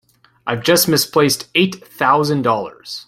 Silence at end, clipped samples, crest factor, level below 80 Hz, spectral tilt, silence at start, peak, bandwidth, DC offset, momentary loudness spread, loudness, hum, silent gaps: 0.05 s; under 0.1%; 16 dB; -56 dBFS; -3.5 dB/octave; 0.45 s; -2 dBFS; 16.5 kHz; under 0.1%; 10 LU; -16 LUFS; none; none